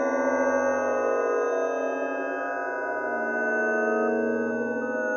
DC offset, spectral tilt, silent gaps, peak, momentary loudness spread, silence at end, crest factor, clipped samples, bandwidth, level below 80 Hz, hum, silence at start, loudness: under 0.1%; -4 dB/octave; none; -12 dBFS; 5 LU; 0 s; 14 dB; under 0.1%; 6.6 kHz; -72 dBFS; none; 0 s; -26 LUFS